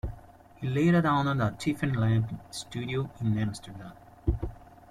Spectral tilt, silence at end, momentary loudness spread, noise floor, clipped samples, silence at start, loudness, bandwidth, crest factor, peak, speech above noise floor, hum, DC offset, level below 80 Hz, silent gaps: -7 dB/octave; 0.25 s; 17 LU; -51 dBFS; under 0.1%; 0.05 s; -29 LUFS; 13.5 kHz; 16 dB; -12 dBFS; 23 dB; none; under 0.1%; -44 dBFS; none